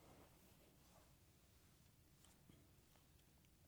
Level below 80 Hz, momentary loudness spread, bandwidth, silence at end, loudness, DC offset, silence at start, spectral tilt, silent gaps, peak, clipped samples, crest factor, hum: -80 dBFS; 2 LU; over 20 kHz; 0 s; -69 LUFS; under 0.1%; 0 s; -4 dB/octave; none; -50 dBFS; under 0.1%; 20 dB; none